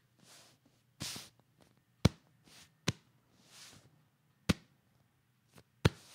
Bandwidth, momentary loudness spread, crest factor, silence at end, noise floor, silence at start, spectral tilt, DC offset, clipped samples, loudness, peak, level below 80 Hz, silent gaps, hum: 16 kHz; 25 LU; 32 dB; 0.2 s; -73 dBFS; 1 s; -5 dB/octave; under 0.1%; under 0.1%; -37 LUFS; -10 dBFS; -58 dBFS; none; none